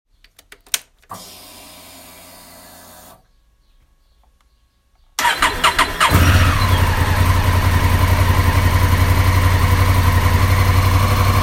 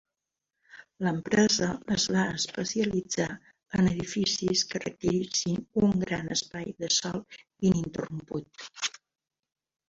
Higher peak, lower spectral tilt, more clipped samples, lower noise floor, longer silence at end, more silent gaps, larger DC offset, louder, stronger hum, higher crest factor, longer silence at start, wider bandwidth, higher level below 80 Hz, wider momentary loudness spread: first, 0 dBFS vs -10 dBFS; about the same, -4.5 dB/octave vs -4 dB/octave; neither; second, -58 dBFS vs -87 dBFS; second, 0 s vs 1 s; neither; neither; first, -15 LUFS vs -28 LUFS; neither; about the same, 16 dB vs 20 dB; about the same, 0.75 s vs 0.75 s; first, 16.5 kHz vs 7.8 kHz; first, -24 dBFS vs -56 dBFS; first, 18 LU vs 11 LU